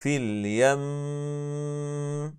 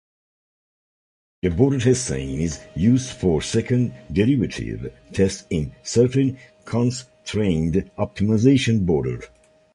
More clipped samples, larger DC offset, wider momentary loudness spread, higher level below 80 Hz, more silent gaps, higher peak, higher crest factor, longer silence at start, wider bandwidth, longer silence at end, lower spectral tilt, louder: neither; neither; about the same, 9 LU vs 11 LU; second, -70 dBFS vs -40 dBFS; neither; second, -10 dBFS vs -4 dBFS; about the same, 18 dB vs 18 dB; second, 0 s vs 1.45 s; about the same, 11 kHz vs 11.5 kHz; second, 0 s vs 0.5 s; about the same, -6 dB/octave vs -6.5 dB/octave; second, -28 LUFS vs -21 LUFS